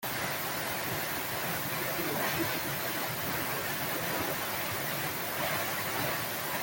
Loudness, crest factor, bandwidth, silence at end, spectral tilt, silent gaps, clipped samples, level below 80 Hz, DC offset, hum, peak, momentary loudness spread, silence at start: -32 LUFS; 16 dB; 17 kHz; 0 s; -3 dB/octave; none; under 0.1%; -62 dBFS; under 0.1%; none; -18 dBFS; 2 LU; 0 s